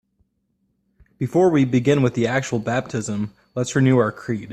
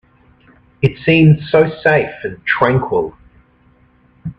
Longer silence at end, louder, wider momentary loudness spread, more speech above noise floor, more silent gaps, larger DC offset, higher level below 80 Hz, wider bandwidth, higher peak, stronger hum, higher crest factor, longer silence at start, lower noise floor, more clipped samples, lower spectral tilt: about the same, 0 s vs 0.05 s; second, -20 LUFS vs -14 LUFS; about the same, 11 LU vs 13 LU; first, 50 dB vs 38 dB; neither; neither; second, -56 dBFS vs -44 dBFS; first, 9.4 kHz vs 5.4 kHz; second, -4 dBFS vs 0 dBFS; neither; about the same, 18 dB vs 16 dB; first, 1.2 s vs 0.8 s; first, -70 dBFS vs -52 dBFS; neither; second, -6.5 dB/octave vs -9.5 dB/octave